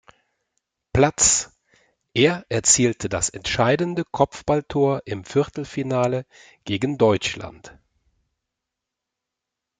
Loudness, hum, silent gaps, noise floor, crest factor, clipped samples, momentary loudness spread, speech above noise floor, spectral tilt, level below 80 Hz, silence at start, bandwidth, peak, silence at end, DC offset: -21 LUFS; none; none; -84 dBFS; 20 dB; under 0.1%; 12 LU; 63 dB; -3.5 dB/octave; -50 dBFS; 0.95 s; 9.8 kHz; -2 dBFS; 2.1 s; under 0.1%